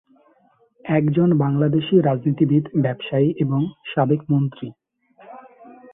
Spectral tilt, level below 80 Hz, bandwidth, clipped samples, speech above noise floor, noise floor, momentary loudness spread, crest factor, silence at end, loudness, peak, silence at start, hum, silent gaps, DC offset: -13 dB/octave; -60 dBFS; 3.8 kHz; under 0.1%; 40 dB; -59 dBFS; 7 LU; 16 dB; 0.2 s; -20 LUFS; -4 dBFS; 0.85 s; none; none; under 0.1%